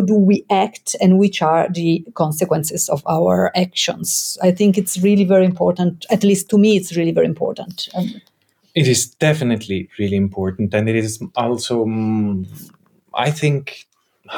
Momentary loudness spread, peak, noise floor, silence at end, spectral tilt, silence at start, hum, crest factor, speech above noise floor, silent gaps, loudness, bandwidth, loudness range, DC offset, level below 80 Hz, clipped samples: 10 LU; -4 dBFS; -36 dBFS; 0 s; -5 dB/octave; 0 s; none; 12 dB; 20 dB; none; -17 LUFS; 19 kHz; 5 LU; under 0.1%; -60 dBFS; under 0.1%